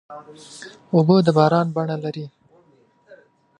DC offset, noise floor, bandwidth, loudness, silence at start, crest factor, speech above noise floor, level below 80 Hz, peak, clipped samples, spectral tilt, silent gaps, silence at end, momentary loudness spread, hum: under 0.1%; -57 dBFS; 10.5 kHz; -18 LUFS; 0.1 s; 20 dB; 38 dB; -66 dBFS; -2 dBFS; under 0.1%; -8 dB/octave; none; 0.45 s; 24 LU; none